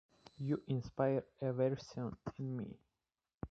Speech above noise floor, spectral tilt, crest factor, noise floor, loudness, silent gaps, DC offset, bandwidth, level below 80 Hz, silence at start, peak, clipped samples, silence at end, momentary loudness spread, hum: over 51 dB; -8.5 dB/octave; 20 dB; under -90 dBFS; -40 LUFS; 3.34-3.38 s; under 0.1%; 7.6 kHz; -66 dBFS; 0.4 s; -20 dBFS; under 0.1%; 0.05 s; 10 LU; none